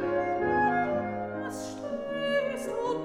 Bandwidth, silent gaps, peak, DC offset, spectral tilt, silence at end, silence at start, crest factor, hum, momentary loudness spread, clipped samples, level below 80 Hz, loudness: 15 kHz; none; -14 dBFS; under 0.1%; -5.5 dB/octave; 0 s; 0 s; 14 dB; none; 10 LU; under 0.1%; -60 dBFS; -30 LUFS